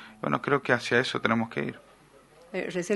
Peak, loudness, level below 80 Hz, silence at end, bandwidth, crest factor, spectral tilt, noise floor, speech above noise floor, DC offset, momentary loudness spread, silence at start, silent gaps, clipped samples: -4 dBFS; -28 LUFS; -66 dBFS; 0 s; 11.5 kHz; 24 dB; -5 dB/octave; -56 dBFS; 29 dB; under 0.1%; 11 LU; 0 s; none; under 0.1%